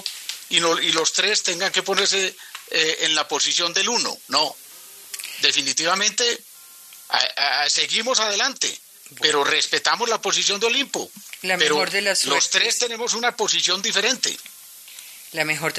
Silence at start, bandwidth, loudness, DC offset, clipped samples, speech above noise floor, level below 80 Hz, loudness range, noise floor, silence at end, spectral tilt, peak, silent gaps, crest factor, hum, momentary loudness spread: 0 s; 14 kHz; -19 LUFS; under 0.1%; under 0.1%; 23 dB; -78 dBFS; 2 LU; -44 dBFS; 0 s; 0 dB/octave; 0 dBFS; none; 22 dB; none; 14 LU